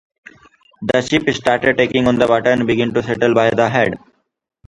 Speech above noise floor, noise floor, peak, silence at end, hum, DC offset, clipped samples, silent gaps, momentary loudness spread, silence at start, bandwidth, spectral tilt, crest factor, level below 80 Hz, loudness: 35 dB; -50 dBFS; 0 dBFS; 0.7 s; none; under 0.1%; under 0.1%; none; 5 LU; 0.8 s; 11 kHz; -5.5 dB/octave; 16 dB; -48 dBFS; -15 LUFS